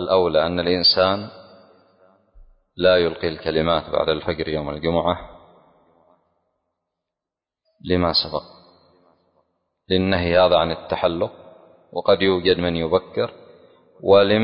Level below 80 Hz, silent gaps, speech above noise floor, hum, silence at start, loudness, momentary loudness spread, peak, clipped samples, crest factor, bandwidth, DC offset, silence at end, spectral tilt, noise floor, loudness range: -44 dBFS; none; 68 dB; none; 0 s; -20 LUFS; 12 LU; -4 dBFS; under 0.1%; 18 dB; 5.6 kHz; under 0.1%; 0 s; -10 dB/octave; -87 dBFS; 7 LU